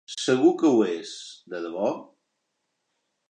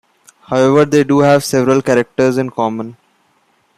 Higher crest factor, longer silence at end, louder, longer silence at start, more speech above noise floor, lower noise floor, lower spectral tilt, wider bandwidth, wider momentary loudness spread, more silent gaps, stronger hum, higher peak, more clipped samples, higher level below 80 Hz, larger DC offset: first, 18 dB vs 12 dB; first, 1.25 s vs 0.85 s; second, -23 LUFS vs -13 LUFS; second, 0.1 s vs 0.5 s; first, 54 dB vs 45 dB; first, -78 dBFS vs -58 dBFS; about the same, -5 dB/octave vs -6 dB/octave; second, 9.6 kHz vs 15.5 kHz; first, 18 LU vs 9 LU; neither; neither; second, -8 dBFS vs -2 dBFS; neither; second, -82 dBFS vs -54 dBFS; neither